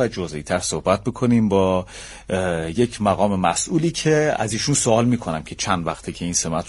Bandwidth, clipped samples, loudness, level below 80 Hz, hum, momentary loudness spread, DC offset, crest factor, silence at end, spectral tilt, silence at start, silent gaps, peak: 11.5 kHz; under 0.1%; -21 LUFS; -44 dBFS; none; 9 LU; under 0.1%; 18 dB; 0 s; -4.5 dB/octave; 0 s; none; -2 dBFS